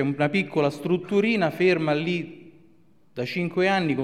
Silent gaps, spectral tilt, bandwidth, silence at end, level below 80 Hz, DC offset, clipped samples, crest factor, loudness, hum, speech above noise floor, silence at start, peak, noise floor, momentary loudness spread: none; -7 dB/octave; 14 kHz; 0 s; -64 dBFS; 0.1%; under 0.1%; 16 dB; -24 LUFS; none; 37 dB; 0 s; -8 dBFS; -60 dBFS; 9 LU